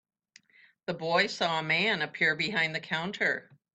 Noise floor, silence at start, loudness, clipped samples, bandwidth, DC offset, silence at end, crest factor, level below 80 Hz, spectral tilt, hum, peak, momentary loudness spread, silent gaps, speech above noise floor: -61 dBFS; 0.9 s; -28 LUFS; under 0.1%; 9.2 kHz; under 0.1%; 0.35 s; 20 dB; -72 dBFS; -4 dB/octave; none; -12 dBFS; 10 LU; none; 32 dB